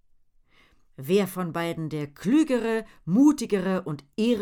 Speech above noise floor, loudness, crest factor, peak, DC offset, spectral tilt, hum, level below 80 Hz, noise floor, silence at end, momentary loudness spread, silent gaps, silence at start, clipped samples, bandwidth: 35 dB; -25 LUFS; 16 dB; -10 dBFS; under 0.1%; -6.5 dB/octave; none; -60 dBFS; -60 dBFS; 0 s; 11 LU; none; 1 s; under 0.1%; 17 kHz